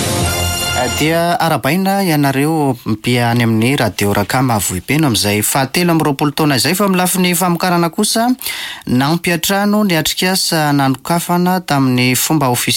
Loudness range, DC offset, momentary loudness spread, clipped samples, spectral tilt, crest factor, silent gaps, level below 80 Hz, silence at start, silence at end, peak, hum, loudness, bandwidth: 1 LU; under 0.1%; 3 LU; under 0.1%; -4.5 dB/octave; 10 dB; none; -40 dBFS; 0 s; 0 s; -4 dBFS; none; -14 LUFS; 17 kHz